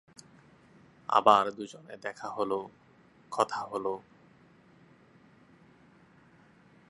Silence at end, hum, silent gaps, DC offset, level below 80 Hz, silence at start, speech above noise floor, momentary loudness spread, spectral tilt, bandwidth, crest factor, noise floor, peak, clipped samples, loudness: 2.9 s; none; none; under 0.1%; -76 dBFS; 1.1 s; 31 dB; 20 LU; -4 dB/octave; 11.5 kHz; 26 dB; -60 dBFS; -6 dBFS; under 0.1%; -29 LUFS